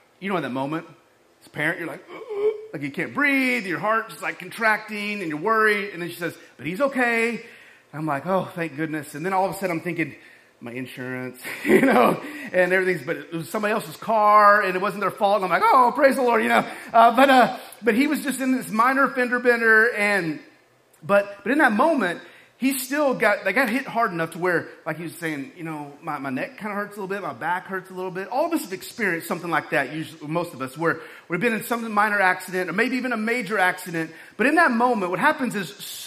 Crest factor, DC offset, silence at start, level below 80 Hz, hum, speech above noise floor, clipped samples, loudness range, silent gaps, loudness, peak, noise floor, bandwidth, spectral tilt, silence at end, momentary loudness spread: 20 dB; under 0.1%; 0.2 s; -70 dBFS; none; 35 dB; under 0.1%; 9 LU; none; -22 LUFS; -2 dBFS; -57 dBFS; 15.5 kHz; -5 dB/octave; 0 s; 15 LU